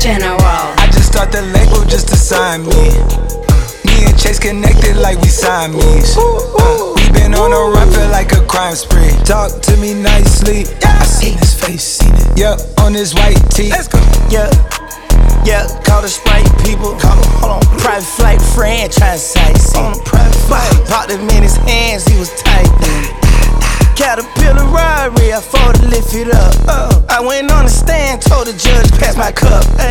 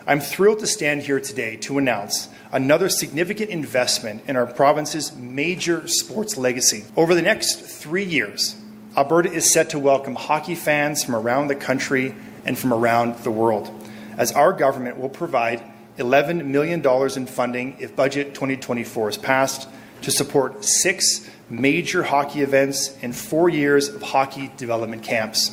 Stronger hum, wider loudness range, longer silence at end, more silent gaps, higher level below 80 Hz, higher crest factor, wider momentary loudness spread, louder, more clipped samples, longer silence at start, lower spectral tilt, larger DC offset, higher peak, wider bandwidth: neither; about the same, 1 LU vs 3 LU; about the same, 0 s vs 0 s; neither; first, -10 dBFS vs -62 dBFS; second, 8 dB vs 20 dB; second, 3 LU vs 9 LU; first, -11 LUFS vs -21 LUFS; neither; about the same, 0 s vs 0 s; first, -4.5 dB/octave vs -3 dB/octave; neither; about the same, 0 dBFS vs 0 dBFS; about the same, 17 kHz vs 16 kHz